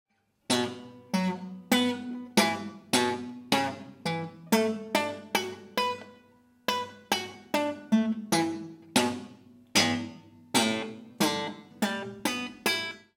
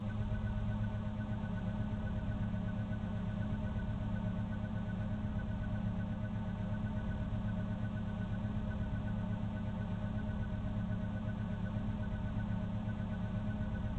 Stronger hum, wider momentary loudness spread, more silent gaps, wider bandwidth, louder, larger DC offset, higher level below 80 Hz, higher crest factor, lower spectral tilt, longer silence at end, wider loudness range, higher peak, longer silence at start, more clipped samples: neither; first, 10 LU vs 1 LU; neither; first, 17 kHz vs 4.4 kHz; first, -29 LUFS vs -39 LUFS; neither; second, -74 dBFS vs -44 dBFS; first, 22 dB vs 12 dB; second, -3.5 dB/octave vs -9 dB/octave; first, 0.15 s vs 0 s; first, 3 LU vs 0 LU; first, -8 dBFS vs -26 dBFS; first, 0.5 s vs 0 s; neither